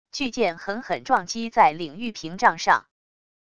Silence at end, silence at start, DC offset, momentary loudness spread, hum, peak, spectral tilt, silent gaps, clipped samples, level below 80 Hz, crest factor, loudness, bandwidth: 0.8 s; 0.15 s; 0.5%; 12 LU; none; -4 dBFS; -3.5 dB/octave; none; under 0.1%; -60 dBFS; 20 dB; -23 LUFS; 11 kHz